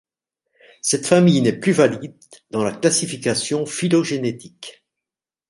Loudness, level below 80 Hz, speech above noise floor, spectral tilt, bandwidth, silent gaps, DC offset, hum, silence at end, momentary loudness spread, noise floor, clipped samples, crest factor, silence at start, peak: -19 LUFS; -62 dBFS; 69 dB; -4.5 dB/octave; 11.5 kHz; none; under 0.1%; none; 0.8 s; 19 LU; -88 dBFS; under 0.1%; 18 dB; 0.85 s; -2 dBFS